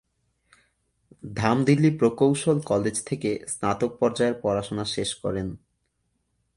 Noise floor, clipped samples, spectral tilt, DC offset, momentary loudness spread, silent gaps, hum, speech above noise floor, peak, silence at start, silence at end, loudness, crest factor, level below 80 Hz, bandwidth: -74 dBFS; under 0.1%; -5.5 dB/octave; under 0.1%; 9 LU; none; none; 50 dB; -6 dBFS; 1.25 s; 1 s; -24 LUFS; 20 dB; -54 dBFS; 11.5 kHz